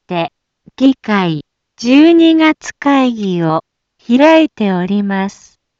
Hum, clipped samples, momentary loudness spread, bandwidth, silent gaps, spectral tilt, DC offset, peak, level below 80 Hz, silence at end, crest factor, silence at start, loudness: none; under 0.1%; 12 LU; 7.6 kHz; none; -6 dB/octave; under 0.1%; 0 dBFS; -58 dBFS; 0.5 s; 12 dB; 0.1 s; -12 LUFS